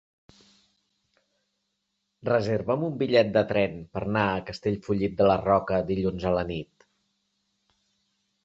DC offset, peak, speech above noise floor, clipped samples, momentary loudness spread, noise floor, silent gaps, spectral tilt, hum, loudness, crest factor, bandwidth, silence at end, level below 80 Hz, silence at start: under 0.1%; -8 dBFS; 54 dB; under 0.1%; 9 LU; -79 dBFS; none; -7.5 dB/octave; none; -26 LUFS; 20 dB; 7.8 kHz; 1.8 s; -52 dBFS; 2.25 s